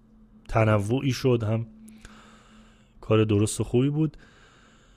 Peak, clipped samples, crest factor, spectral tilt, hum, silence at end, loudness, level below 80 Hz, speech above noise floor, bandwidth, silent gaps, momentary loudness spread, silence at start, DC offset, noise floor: -8 dBFS; under 0.1%; 18 dB; -6.5 dB/octave; none; 0.8 s; -25 LUFS; -48 dBFS; 32 dB; 15 kHz; none; 7 LU; 0.5 s; under 0.1%; -55 dBFS